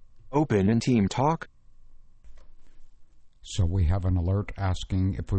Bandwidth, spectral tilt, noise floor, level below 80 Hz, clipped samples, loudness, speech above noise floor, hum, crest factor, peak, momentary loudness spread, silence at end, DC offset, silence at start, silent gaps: 8.8 kHz; -7 dB/octave; -49 dBFS; -38 dBFS; under 0.1%; -26 LUFS; 24 dB; none; 16 dB; -10 dBFS; 7 LU; 0 s; under 0.1%; 0 s; none